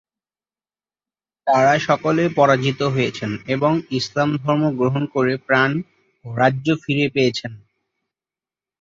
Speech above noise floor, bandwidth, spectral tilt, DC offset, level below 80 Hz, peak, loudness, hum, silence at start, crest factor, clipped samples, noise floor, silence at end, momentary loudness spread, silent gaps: over 71 dB; 7.6 kHz; -6 dB/octave; under 0.1%; -58 dBFS; -2 dBFS; -19 LUFS; 50 Hz at -45 dBFS; 1.45 s; 18 dB; under 0.1%; under -90 dBFS; 1.25 s; 8 LU; none